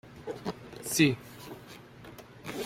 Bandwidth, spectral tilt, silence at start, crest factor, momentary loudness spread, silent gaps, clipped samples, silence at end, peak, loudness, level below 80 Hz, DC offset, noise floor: 16.5 kHz; -4 dB/octave; 0.05 s; 22 dB; 23 LU; none; under 0.1%; 0 s; -10 dBFS; -31 LUFS; -62 dBFS; under 0.1%; -50 dBFS